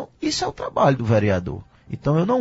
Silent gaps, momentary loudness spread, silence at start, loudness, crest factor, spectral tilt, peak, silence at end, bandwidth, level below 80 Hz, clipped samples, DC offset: none; 14 LU; 0 s; -21 LUFS; 16 dB; -6 dB/octave; -6 dBFS; 0 s; 8 kHz; -48 dBFS; under 0.1%; under 0.1%